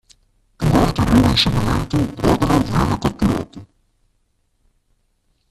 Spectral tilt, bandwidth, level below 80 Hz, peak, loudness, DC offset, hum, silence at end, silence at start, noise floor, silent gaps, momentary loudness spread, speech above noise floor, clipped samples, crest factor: -6 dB/octave; 14.5 kHz; -32 dBFS; -2 dBFS; -17 LUFS; under 0.1%; none; 1.85 s; 0.6 s; -65 dBFS; none; 7 LU; 49 dB; under 0.1%; 18 dB